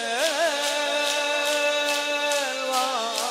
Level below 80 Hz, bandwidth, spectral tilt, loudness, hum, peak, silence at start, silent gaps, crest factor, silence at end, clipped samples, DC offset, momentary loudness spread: -88 dBFS; 16 kHz; 1.5 dB/octave; -23 LUFS; none; -8 dBFS; 0 s; none; 16 dB; 0 s; under 0.1%; under 0.1%; 3 LU